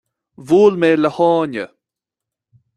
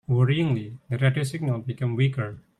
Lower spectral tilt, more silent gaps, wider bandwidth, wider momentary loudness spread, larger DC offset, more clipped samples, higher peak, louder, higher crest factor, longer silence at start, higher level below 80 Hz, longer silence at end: about the same, -7 dB/octave vs -7 dB/octave; neither; about the same, 11 kHz vs 11.5 kHz; first, 14 LU vs 8 LU; neither; neither; first, -2 dBFS vs -10 dBFS; first, -15 LUFS vs -25 LUFS; about the same, 16 dB vs 16 dB; first, 0.4 s vs 0.1 s; about the same, -62 dBFS vs -60 dBFS; first, 1.1 s vs 0.2 s